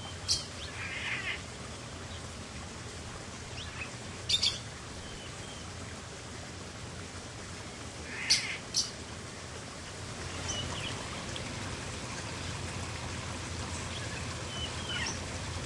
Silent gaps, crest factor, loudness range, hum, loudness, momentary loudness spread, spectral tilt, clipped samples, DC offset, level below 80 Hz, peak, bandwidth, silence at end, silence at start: none; 26 dB; 5 LU; none; -36 LUFS; 12 LU; -2.5 dB/octave; under 0.1%; under 0.1%; -54 dBFS; -12 dBFS; 11.5 kHz; 0 s; 0 s